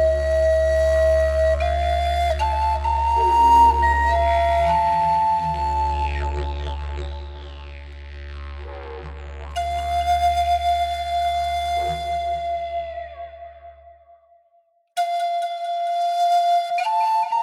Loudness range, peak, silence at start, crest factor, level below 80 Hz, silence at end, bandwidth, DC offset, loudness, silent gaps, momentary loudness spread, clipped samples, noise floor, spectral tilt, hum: 12 LU; -6 dBFS; 0 s; 16 dB; -30 dBFS; 0 s; 15 kHz; under 0.1%; -20 LUFS; none; 18 LU; under 0.1%; -61 dBFS; -5 dB/octave; none